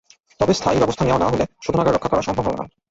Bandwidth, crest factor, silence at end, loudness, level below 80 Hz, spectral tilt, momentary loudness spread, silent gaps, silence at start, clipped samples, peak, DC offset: 8 kHz; 16 dB; 0.25 s; -20 LUFS; -40 dBFS; -6 dB/octave; 5 LU; none; 0.4 s; under 0.1%; -4 dBFS; under 0.1%